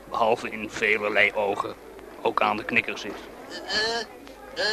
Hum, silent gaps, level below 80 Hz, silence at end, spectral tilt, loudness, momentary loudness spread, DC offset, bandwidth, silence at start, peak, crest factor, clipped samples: none; none; -58 dBFS; 0 s; -3 dB/octave; -25 LUFS; 17 LU; under 0.1%; 13.5 kHz; 0 s; -6 dBFS; 20 dB; under 0.1%